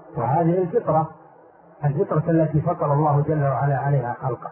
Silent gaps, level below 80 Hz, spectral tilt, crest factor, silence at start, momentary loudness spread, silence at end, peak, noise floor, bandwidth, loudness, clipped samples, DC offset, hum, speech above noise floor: none; -54 dBFS; -14 dB/octave; 14 dB; 0.05 s; 6 LU; 0 s; -8 dBFS; -49 dBFS; 2.9 kHz; -22 LUFS; under 0.1%; under 0.1%; none; 29 dB